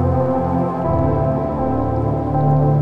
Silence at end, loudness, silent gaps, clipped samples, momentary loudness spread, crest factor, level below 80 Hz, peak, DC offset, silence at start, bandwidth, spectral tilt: 0 s; -18 LUFS; none; under 0.1%; 4 LU; 12 dB; -32 dBFS; -6 dBFS; 1%; 0 s; 4.4 kHz; -11.5 dB/octave